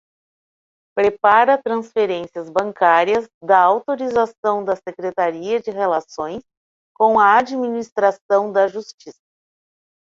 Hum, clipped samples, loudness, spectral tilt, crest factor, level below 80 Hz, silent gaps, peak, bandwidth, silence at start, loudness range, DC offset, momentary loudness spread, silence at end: none; under 0.1%; -18 LUFS; -5 dB/octave; 18 dB; -62 dBFS; 3.34-3.41 s, 4.38-4.43 s, 6.57-6.95 s, 7.92-7.96 s, 8.21-8.29 s, 8.94-8.98 s; -2 dBFS; 7.6 kHz; 0.95 s; 3 LU; under 0.1%; 12 LU; 0.95 s